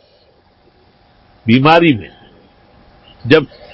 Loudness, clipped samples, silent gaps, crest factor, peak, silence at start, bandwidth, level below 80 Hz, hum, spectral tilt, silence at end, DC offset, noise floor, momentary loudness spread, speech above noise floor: -12 LUFS; under 0.1%; none; 16 dB; 0 dBFS; 1.45 s; 8 kHz; -48 dBFS; none; -8 dB/octave; 0.3 s; under 0.1%; -51 dBFS; 14 LU; 40 dB